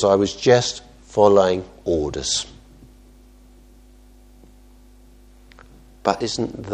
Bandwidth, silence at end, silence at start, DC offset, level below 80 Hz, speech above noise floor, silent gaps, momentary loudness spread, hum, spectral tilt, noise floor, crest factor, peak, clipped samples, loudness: 9.8 kHz; 0 s; 0 s; under 0.1%; -46 dBFS; 29 dB; none; 11 LU; none; -4 dB/octave; -48 dBFS; 22 dB; 0 dBFS; under 0.1%; -20 LUFS